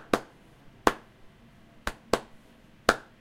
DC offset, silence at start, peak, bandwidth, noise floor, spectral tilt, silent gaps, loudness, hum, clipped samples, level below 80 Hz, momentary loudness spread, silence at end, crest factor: under 0.1%; 0.1 s; 0 dBFS; 16 kHz; -56 dBFS; -3.5 dB/octave; none; -30 LUFS; none; under 0.1%; -50 dBFS; 11 LU; 0.2 s; 32 dB